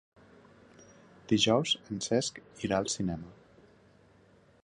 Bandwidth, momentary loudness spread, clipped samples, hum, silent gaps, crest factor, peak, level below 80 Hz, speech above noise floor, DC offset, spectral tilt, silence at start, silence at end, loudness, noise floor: 10.5 kHz; 13 LU; under 0.1%; none; none; 22 dB; -12 dBFS; -60 dBFS; 31 dB; under 0.1%; -4 dB/octave; 1.3 s; 1.3 s; -30 LUFS; -62 dBFS